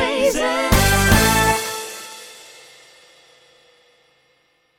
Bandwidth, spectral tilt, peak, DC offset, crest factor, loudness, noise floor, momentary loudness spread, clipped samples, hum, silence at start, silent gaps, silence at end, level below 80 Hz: 17 kHz; -3.5 dB/octave; -2 dBFS; under 0.1%; 18 dB; -16 LUFS; -62 dBFS; 22 LU; under 0.1%; none; 0 s; none; 2.4 s; -30 dBFS